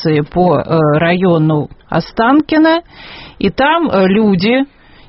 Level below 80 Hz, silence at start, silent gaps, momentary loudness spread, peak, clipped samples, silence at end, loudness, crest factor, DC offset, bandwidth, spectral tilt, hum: -40 dBFS; 0 s; none; 8 LU; 0 dBFS; under 0.1%; 0.45 s; -12 LUFS; 12 dB; under 0.1%; 6 kHz; -5.5 dB/octave; none